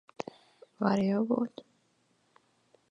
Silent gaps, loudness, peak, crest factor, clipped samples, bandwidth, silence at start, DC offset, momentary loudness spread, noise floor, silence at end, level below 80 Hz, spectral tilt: none; -30 LUFS; -12 dBFS; 22 dB; under 0.1%; 7.6 kHz; 0.2 s; under 0.1%; 16 LU; -72 dBFS; 1.3 s; -78 dBFS; -7.5 dB/octave